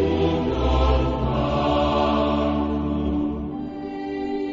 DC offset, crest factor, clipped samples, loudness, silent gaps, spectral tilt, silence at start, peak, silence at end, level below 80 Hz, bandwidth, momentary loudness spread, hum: under 0.1%; 14 dB; under 0.1%; -23 LUFS; none; -8 dB/octave; 0 s; -8 dBFS; 0 s; -28 dBFS; 7.4 kHz; 9 LU; none